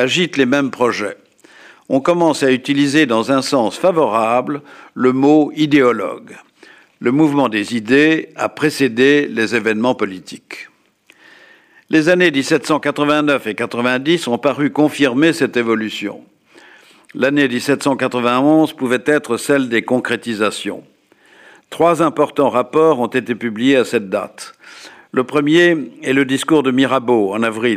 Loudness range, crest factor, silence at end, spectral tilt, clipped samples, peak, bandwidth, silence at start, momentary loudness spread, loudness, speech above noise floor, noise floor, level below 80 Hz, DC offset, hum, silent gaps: 3 LU; 14 dB; 0 s; -5 dB/octave; under 0.1%; -2 dBFS; 15 kHz; 0 s; 10 LU; -15 LUFS; 37 dB; -53 dBFS; -64 dBFS; under 0.1%; none; none